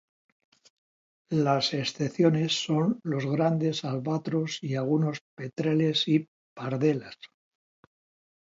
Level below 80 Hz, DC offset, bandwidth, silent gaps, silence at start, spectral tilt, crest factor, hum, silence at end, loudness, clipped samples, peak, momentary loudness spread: -72 dBFS; under 0.1%; 7.8 kHz; 5.21-5.37 s, 6.28-6.56 s; 1.3 s; -6 dB/octave; 18 dB; none; 1.2 s; -27 LUFS; under 0.1%; -10 dBFS; 10 LU